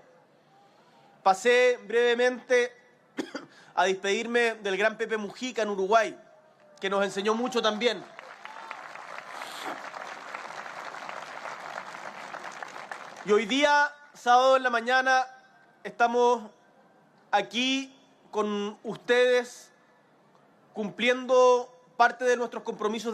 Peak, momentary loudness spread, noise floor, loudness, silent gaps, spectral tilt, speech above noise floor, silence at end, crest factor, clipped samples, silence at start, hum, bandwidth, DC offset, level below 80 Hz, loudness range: -8 dBFS; 18 LU; -61 dBFS; -26 LUFS; none; -3 dB/octave; 36 dB; 0 s; 20 dB; under 0.1%; 1.25 s; none; 12.5 kHz; under 0.1%; -84 dBFS; 14 LU